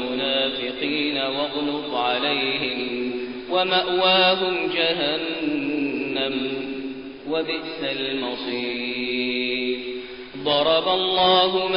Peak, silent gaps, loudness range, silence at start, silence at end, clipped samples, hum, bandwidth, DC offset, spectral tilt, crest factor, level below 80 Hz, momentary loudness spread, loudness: -6 dBFS; none; 5 LU; 0 s; 0 s; under 0.1%; none; 5.4 kHz; under 0.1%; -1 dB/octave; 16 dB; -58 dBFS; 11 LU; -22 LUFS